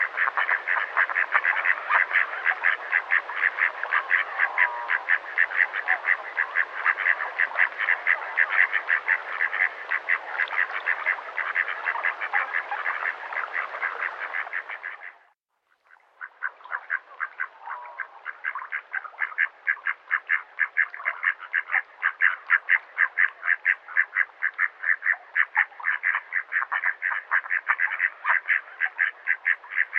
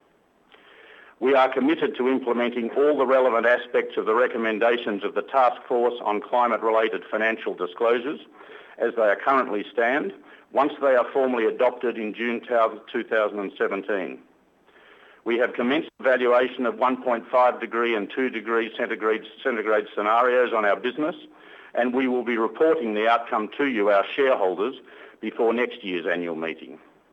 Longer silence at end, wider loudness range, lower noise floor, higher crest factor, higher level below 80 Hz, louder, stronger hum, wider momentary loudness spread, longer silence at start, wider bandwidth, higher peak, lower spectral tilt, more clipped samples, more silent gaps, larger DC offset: second, 0 s vs 0.35 s; first, 10 LU vs 3 LU; first, -71 dBFS vs -61 dBFS; first, 22 dB vs 16 dB; second, -86 dBFS vs -80 dBFS; about the same, -24 LUFS vs -23 LUFS; neither; about the same, 10 LU vs 8 LU; second, 0 s vs 1.2 s; second, 6.6 kHz vs 7.8 kHz; first, -4 dBFS vs -8 dBFS; second, 0 dB/octave vs -6 dB/octave; neither; neither; neither